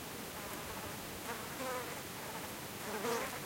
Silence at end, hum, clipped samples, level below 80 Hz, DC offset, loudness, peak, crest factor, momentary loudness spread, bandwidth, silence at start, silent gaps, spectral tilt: 0 s; none; under 0.1%; -64 dBFS; under 0.1%; -42 LUFS; -24 dBFS; 18 dB; 6 LU; 16.5 kHz; 0 s; none; -3 dB/octave